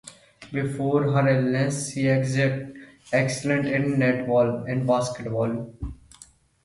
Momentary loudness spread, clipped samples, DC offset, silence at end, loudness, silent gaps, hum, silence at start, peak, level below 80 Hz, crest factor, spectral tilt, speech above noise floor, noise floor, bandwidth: 11 LU; under 0.1%; under 0.1%; 0.7 s; -24 LUFS; none; none; 0.05 s; -8 dBFS; -50 dBFS; 16 dB; -6.5 dB/octave; 29 dB; -53 dBFS; 11.5 kHz